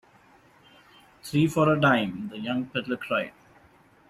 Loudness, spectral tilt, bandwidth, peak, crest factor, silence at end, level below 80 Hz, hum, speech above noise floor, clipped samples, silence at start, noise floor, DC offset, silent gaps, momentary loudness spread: -25 LUFS; -6.5 dB/octave; 14.5 kHz; -8 dBFS; 20 dB; 0.8 s; -62 dBFS; none; 33 dB; under 0.1%; 1.25 s; -58 dBFS; under 0.1%; none; 12 LU